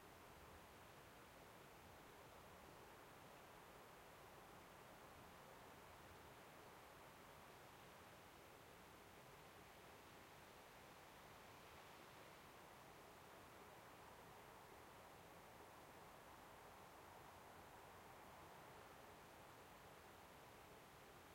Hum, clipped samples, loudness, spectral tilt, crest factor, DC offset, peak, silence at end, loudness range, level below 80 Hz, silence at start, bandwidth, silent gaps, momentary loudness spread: none; under 0.1%; -63 LUFS; -3.5 dB/octave; 14 dB; under 0.1%; -50 dBFS; 0 s; 1 LU; -80 dBFS; 0 s; 16.5 kHz; none; 1 LU